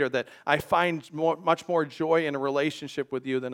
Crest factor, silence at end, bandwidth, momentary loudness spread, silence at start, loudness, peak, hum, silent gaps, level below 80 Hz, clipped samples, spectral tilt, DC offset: 20 dB; 0 s; 17.5 kHz; 6 LU; 0 s; -27 LUFS; -6 dBFS; none; none; -66 dBFS; under 0.1%; -5.5 dB/octave; under 0.1%